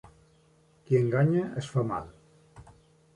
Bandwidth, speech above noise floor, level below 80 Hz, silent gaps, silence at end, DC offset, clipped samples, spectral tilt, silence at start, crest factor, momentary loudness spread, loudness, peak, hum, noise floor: 11 kHz; 36 dB; -60 dBFS; none; 0.55 s; under 0.1%; under 0.1%; -8.5 dB/octave; 0.9 s; 18 dB; 11 LU; -28 LUFS; -12 dBFS; none; -63 dBFS